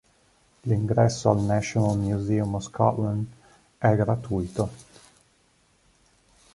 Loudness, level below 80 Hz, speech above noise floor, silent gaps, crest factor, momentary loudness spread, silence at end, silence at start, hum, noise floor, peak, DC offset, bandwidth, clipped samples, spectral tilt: -25 LUFS; -48 dBFS; 40 dB; none; 22 dB; 9 LU; 1.75 s; 0.65 s; none; -64 dBFS; -4 dBFS; under 0.1%; 11.5 kHz; under 0.1%; -7 dB/octave